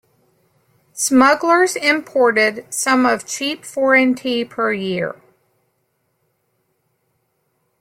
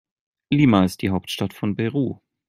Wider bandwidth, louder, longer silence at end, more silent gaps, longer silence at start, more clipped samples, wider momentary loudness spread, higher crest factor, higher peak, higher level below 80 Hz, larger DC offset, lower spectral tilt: about the same, 16 kHz vs 15.5 kHz; first, -16 LUFS vs -21 LUFS; first, 2.7 s vs 0.35 s; neither; first, 0.95 s vs 0.5 s; neither; about the same, 10 LU vs 9 LU; about the same, 18 dB vs 20 dB; about the same, -2 dBFS vs -2 dBFS; second, -66 dBFS vs -56 dBFS; neither; second, -3 dB/octave vs -6.5 dB/octave